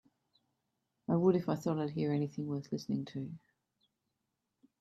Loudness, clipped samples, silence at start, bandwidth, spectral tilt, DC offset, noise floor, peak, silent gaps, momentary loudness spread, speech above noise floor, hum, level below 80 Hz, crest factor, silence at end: -35 LUFS; under 0.1%; 1.1 s; 13 kHz; -8.5 dB/octave; under 0.1%; -86 dBFS; -18 dBFS; none; 15 LU; 52 dB; none; -76 dBFS; 20 dB; 1.45 s